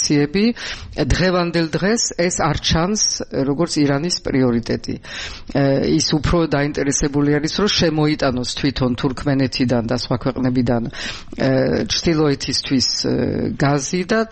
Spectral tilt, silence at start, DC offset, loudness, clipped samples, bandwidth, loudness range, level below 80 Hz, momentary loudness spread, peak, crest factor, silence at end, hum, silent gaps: -4.5 dB/octave; 0 s; under 0.1%; -18 LUFS; under 0.1%; 8.8 kHz; 2 LU; -34 dBFS; 5 LU; -2 dBFS; 16 dB; 0 s; none; none